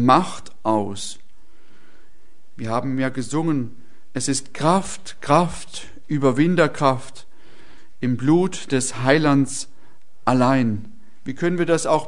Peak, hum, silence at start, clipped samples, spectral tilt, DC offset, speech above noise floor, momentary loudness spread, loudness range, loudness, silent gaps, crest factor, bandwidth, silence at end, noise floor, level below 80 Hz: 0 dBFS; none; 0 s; under 0.1%; -5.5 dB/octave; 3%; 38 dB; 16 LU; 6 LU; -21 LUFS; none; 20 dB; 11 kHz; 0 s; -58 dBFS; -54 dBFS